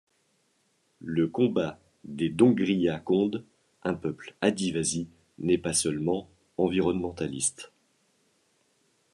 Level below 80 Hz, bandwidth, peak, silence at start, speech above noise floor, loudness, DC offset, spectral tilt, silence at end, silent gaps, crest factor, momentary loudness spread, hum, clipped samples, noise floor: -62 dBFS; 12.5 kHz; -6 dBFS; 1 s; 44 dB; -28 LUFS; under 0.1%; -5 dB/octave; 1.45 s; none; 22 dB; 15 LU; none; under 0.1%; -71 dBFS